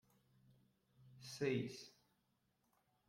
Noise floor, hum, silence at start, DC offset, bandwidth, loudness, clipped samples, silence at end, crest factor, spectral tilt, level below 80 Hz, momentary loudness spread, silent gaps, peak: -83 dBFS; none; 1 s; under 0.1%; 16 kHz; -44 LUFS; under 0.1%; 1.2 s; 22 dB; -5.5 dB/octave; -84 dBFS; 18 LU; none; -28 dBFS